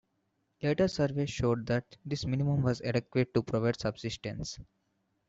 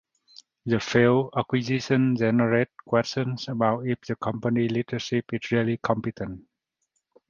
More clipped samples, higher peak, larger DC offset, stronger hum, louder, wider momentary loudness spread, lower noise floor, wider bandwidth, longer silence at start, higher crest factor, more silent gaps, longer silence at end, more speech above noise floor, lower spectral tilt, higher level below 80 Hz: neither; second, -14 dBFS vs -6 dBFS; neither; neither; second, -32 LUFS vs -25 LUFS; about the same, 9 LU vs 8 LU; about the same, -78 dBFS vs -77 dBFS; about the same, 8 kHz vs 7.4 kHz; about the same, 0.6 s vs 0.65 s; about the same, 18 dB vs 20 dB; neither; second, 0.65 s vs 0.9 s; second, 47 dB vs 53 dB; about the same, -6.5 dB/octave vs -6.5 dB/octave; about the same, -56 dBFS vs -60 dBFS